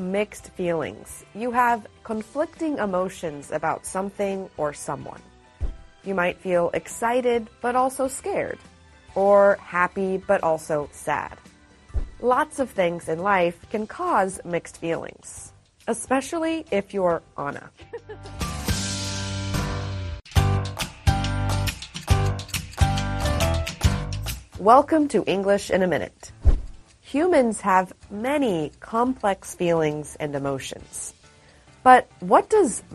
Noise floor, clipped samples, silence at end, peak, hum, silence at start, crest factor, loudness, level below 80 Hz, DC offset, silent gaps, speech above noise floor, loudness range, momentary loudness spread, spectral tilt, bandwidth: -53 dBFS; under 0.1%; 0 s; -2 dBFS; none; 0 s; 22 dB; -24 LUFS; -36 dBFS; under 0.1%; none; 29 dB; 6 LU; 14 LU; -5.5 dB/octave; 13 kHz